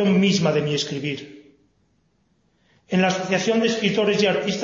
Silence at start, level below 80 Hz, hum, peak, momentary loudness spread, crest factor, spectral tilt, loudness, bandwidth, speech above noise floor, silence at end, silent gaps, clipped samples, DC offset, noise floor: 0 s; -62 dBFS; none; -6 dBFS; 8 LU; 16 dB; -5 dB/octave; -21 LUFS; 7.6 kHz; 45 dB; 0 s; none; under 0.1%; under 0.1%; -65 dBFS